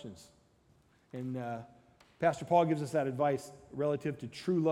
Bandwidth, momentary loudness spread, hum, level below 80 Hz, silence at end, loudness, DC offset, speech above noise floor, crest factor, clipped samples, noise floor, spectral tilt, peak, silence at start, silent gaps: 14.5 kHz; 16 LU; none; -70 dBFS; 0 s; -33 LUFS; under 0.1%; 34 dB; 20 dB; under 0.1%; -67 dBFS; -7 dB/octave; -14 dBFS; 0 s; none